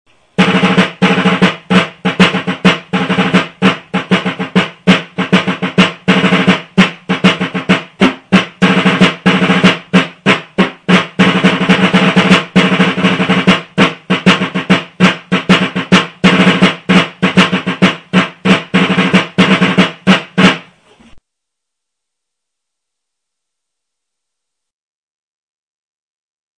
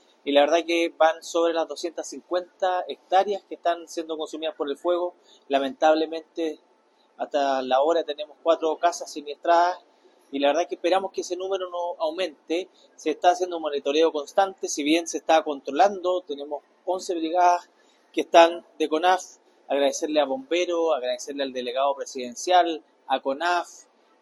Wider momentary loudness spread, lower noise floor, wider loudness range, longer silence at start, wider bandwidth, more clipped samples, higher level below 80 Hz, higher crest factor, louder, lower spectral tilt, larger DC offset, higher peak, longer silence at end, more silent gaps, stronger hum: second, 5 LU vs 11 LU; first, -78 dBFS vs -62 dBFS; about the same, 3 LU vs 4 LU; first, 0.4 s vs 0.25 s; second, 11 kHz vs 12.5 kHz; first, 1% vs under 0.1%; first, -46 dBFS vs -80 dBFS; second, 12 dB vs 22 dB; first, -11 LUFS vs -24 LUFS; first, -5.5 dB/octave vs -2 dB/octave; neither; about the same, 0 dBFS vs -2 dBFS; first, 5.4 s vs 0.4 s; neither; neither